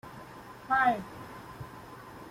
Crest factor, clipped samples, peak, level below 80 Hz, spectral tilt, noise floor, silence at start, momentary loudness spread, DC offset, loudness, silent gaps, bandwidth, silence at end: 20 dB; under 0.1%; -14 dBFS; -62 dBFS; -5.5 dB/octave; -48 dBFS; 0.05 s; 21 LU; under 0.1%; -28 LUFS; none; 16.5 kHz; 0 s